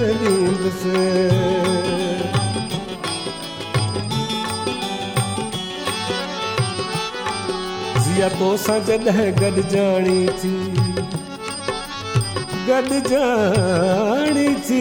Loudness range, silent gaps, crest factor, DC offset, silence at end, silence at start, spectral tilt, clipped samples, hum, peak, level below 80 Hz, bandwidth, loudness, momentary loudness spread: 5 LU; none; 16 dB; under 0.1%; 0 s; 0 s; -5 dB/octave; under 0.1%; none; -4 dBFS; -46 dBFS; 17 kHz; -20 LUFS; 8 LU